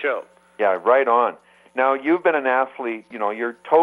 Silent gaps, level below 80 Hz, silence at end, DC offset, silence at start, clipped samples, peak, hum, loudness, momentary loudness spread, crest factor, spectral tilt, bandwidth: none; -76 dBFS; 0 s; under 0.1%; 0 s; under 0.1%; -4 dBFS; none; -21 LUFS; 12 LU; 16 dB; -6.5 dB/octave; 10.5 kHz